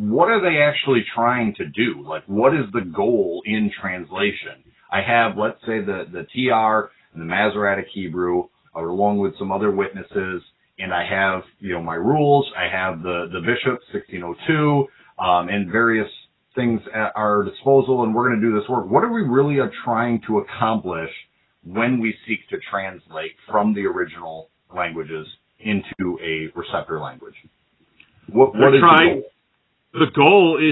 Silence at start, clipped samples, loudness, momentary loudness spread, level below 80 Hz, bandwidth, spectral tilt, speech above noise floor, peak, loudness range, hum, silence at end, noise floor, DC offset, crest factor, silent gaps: 0 s; under 0.1%; -20 LUFS; 14 LU; -54 dBFS; 4.1 kHz; -10 dB/octave; 48 dB; 0 dBFS; 8 LU; none; 0 s; -68 dBFS; under 0.1%; 20 dB; none